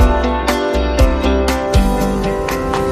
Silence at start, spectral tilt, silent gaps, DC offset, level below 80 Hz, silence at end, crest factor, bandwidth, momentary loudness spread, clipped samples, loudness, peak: 0 s; -6 dB/octave; none; under 0.1%; -18 dBFS; 0 s; 14 dB; 15.5 kHz; 4 LU; under 0.1%; -16 LUFS; 0 dBFS